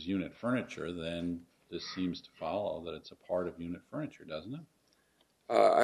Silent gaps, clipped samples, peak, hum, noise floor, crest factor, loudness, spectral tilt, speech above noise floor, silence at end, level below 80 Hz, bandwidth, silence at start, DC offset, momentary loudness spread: none; under 0.1%; -12 dBFS; none; -72 dBFS; 22 dB; -37 LUFS; -6 dB/octave; 38 dB; 0 s; -66 dBFS; 13 kHz; 0 s; under 0.1%; 11 LU